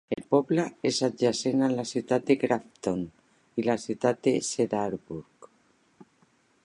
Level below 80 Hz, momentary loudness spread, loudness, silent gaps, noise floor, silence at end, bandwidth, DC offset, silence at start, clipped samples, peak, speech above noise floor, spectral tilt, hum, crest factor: -66 dBFS; 9 LU; -27 LUFS; none; -65 dBFS; 1.45 s; 11.5 kHz; under 0.1%; 0.1 s; under 0.1%; -8 dBFS; 39 dB; -5 dB/octave; none; 20 dB